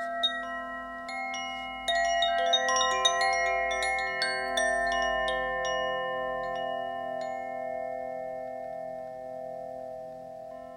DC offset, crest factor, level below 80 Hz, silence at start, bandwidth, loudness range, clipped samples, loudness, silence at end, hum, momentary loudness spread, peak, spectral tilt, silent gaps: under 0.1%; 20 dB; -58 dBFS; 0 s; 16 kHz; 11 LU; under 0.1%; -29 LUFS; 0 s; none; 15 LU; -10 dBFS; -1 dB/octave; none